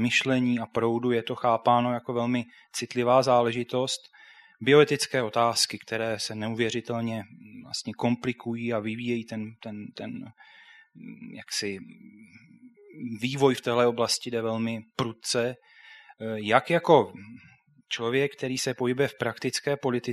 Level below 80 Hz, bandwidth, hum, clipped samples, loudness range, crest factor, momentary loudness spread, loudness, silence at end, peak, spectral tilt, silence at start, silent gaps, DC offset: -70 dBFS; 13.5 kHz; none; under 0.1%; 10 LU; 24 dB; 17 LU; -26 LUFS; 0 s; -4 dBFS; -4.5 dB/octave; 0 s; none; under 0.1%